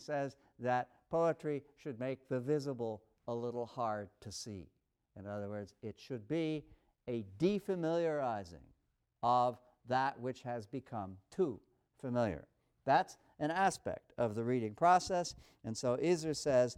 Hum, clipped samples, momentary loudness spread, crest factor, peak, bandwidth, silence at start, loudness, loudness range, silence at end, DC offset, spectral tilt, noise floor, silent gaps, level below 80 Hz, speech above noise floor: none; under 0.1%; 14 LU; 20 dB; -18 dBFS; 15 kHz; 0 s; -37 LUFS; 8 LU; 0.05 s; under 0.1%; -5.5 dB/octave; -78 dBFS; none; -70 dBFS; 42 dB